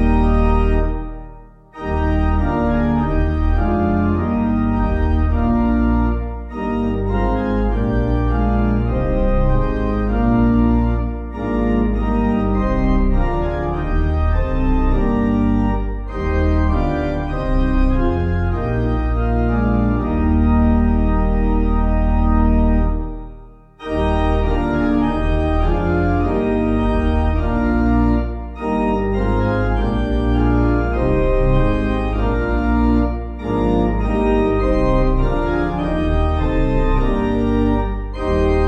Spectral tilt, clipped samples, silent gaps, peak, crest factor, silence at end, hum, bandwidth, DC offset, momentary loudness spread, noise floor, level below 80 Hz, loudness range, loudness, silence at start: -9.5 dB/octave; under 0.1%; none; -4 dBFS; 12 dB; 0 s; none; 6 kHz; under 0.1%; 5 LU; -39 dBFS; -20 dBFS; 2 LU; -18 LUFS; 0 s